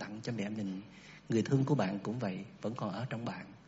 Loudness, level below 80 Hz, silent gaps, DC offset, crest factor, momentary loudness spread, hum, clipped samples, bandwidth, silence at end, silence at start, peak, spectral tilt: -36 LUFS; -72 dBFS; none; under 0.1%; 20 dB; 12 LU; none; under 0.1%; 7.6 kHz; 0.05 s; 0 s; -16 dBFS; -7 dB/octave